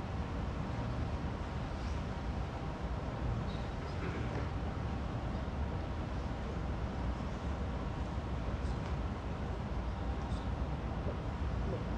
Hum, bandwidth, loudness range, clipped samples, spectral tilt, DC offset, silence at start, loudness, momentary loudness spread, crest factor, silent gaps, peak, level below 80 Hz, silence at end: none; 8.8 kHz; 0 LU; under 0.1%; -7.5 dB/octave; under 0.1%; 0 s; -39 LUFS; 2 LU; 12 dB; none; -24 dBFS; -42 dBFS; 0 s